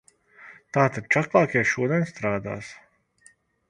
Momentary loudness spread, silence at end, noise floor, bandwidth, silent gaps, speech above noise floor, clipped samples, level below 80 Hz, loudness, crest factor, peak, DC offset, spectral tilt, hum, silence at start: 14 LU; 0.95 s; -59 dBFS; 11 kHz; none; 35 dB; under 0.1%; -60 dBFS; -23 LUFS; 24 dB; -2 dBFS; under 0.1%; -6.5 dB/octave; none; 0.4 s